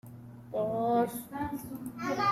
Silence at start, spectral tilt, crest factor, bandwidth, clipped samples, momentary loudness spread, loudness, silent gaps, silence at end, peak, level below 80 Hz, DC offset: 0.05 s; -6 dB/octave; 16 dB; 16 kHz; under 0.1%; 13 LU; -33 LUFS; none; 0 s; -18 dBFS; -62 dBFS; under 0.1%